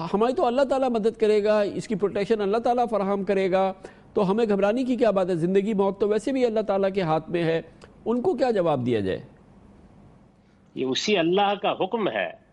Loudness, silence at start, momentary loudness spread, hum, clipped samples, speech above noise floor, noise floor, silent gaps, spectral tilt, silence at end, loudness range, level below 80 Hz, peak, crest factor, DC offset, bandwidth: -24 LUFS; 0 s; 6 LU; none; under 0.1%; 33 dB; -56 dBFS; none; -6 dB/octave; 0.15 s; 4 LU; -58 dBFS; -10 dBFS; 14 dB; under 0.1%; 11 kHz